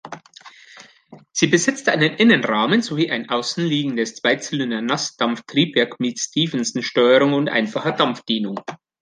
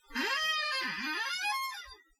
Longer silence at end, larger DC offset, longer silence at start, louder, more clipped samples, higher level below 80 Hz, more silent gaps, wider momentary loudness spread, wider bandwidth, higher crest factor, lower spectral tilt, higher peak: about the same, 0.25 s vs 0.25 s; neither; about the same, 0.05 s vs 0.1 s; first, -19 LUFS vs -32 LUFS; neither; about the same, -68 dBFS vs -66 dBFS; neither; about the same, 8 LU vs 7 LU; second, 10 kHz vs 16.5 kHz; about the same, 18 dB vs 14 dB; first, -4 dB/octave vs -0.5 dB/octave; first, -2 dBFS vs -22 dBFS